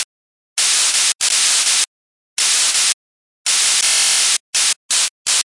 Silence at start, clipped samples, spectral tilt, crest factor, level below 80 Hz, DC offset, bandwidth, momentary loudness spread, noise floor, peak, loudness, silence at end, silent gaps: 0 s; under 0.1%; 4.5 dB/octave; 14 dB; -68 dBFS; 0.2%; 12 kHz; 10 LU; under -90 dBFS; -4 dBFS; -13 LUFS; 0.15 s; 0.04-0.56 s, 1.15-1.19 s, 1.87-2.37 s, 2.94-3.45 s, 4.40-4.53 s, 4.76-4.89 s, 5.10-5.25 s